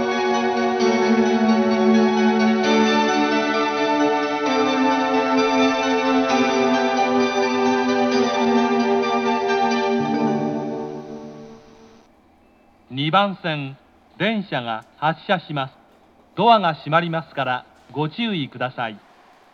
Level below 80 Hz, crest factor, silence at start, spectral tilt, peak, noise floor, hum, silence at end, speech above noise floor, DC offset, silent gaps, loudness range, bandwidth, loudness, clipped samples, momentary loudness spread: -64 dBFS; 20 dB; 0 s; -5 dB/octave; -2 dBFS; -54 dBFS; none; 0.55 s; 33 dB; under 0.1%; none; 8 LU; 6.8 kHz; -20 LUFS; under 0.1%; 11 LU